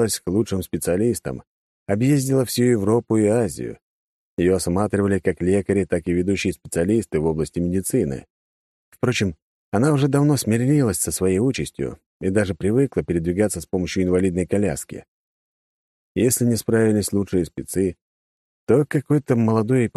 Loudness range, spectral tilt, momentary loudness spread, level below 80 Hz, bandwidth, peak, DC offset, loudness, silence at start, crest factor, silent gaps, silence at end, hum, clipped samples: 3 LU; -6 dB/octave; 9 LU; -48 dBFS; 13 kHz; -4 dBFS; under 0.1%; -21 LUFS; 0 s; 16 dB; 1.47-1.86 s, 3.82-4.37 s, 8.30-8.92 s, 9.42-9.72 s, 12.06-12.20 s, 15.08-16.15 s, 18.02-18.67 s; 0.1 s; none; under 0.1%